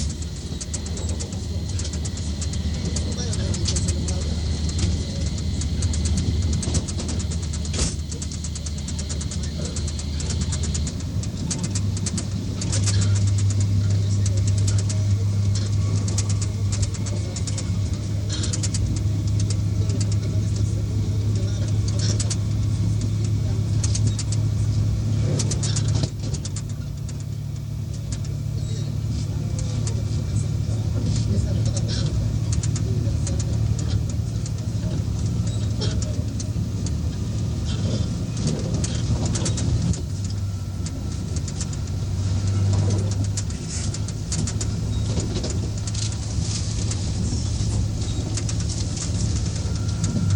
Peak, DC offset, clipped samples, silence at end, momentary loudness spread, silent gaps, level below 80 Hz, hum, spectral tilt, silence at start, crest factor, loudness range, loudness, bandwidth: -8 dBFS; under 0.1%; under 0.1%; 0 s; 6 LU; none; -32 dBFS; none; -5.5 dB/octave; 0 s; 14 dB; 4 LU; -24 LUFS; 11 kHz